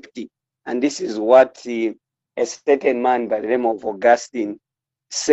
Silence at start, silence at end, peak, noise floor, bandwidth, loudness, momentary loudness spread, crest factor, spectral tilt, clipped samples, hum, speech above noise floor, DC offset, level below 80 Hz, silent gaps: 0.15 s; 0 s; -2 dBFS; -44 dBFS; 8.2 kHz; -19 LUFS; 21 LU; 18 dB; -3 dB/octave; under 0.1%; none; 25 dB; under 0.1%; -68 dBFS; none